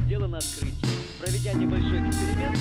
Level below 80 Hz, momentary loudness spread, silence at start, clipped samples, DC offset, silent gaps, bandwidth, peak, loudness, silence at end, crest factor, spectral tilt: -34 dBFS; 5 LU; 0 s; under 0.1%; under 0.1%; none; over 20 kHz; -14 dBFS; -27 LUFS; 0 s; 12 dB; -5.5 dB/octave